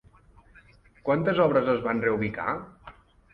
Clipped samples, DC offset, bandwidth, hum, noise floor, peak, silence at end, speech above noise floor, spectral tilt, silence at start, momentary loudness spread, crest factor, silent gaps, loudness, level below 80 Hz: under 0.1%; under 0.1%; 5.6 kHz; none; -56 dBFS; -10 dBFS; 0.4 s; 31 dB; -9 dB/octave; 1.05 s; 13 LU; 18 dB; none; -26 LUFS; -56 dBFS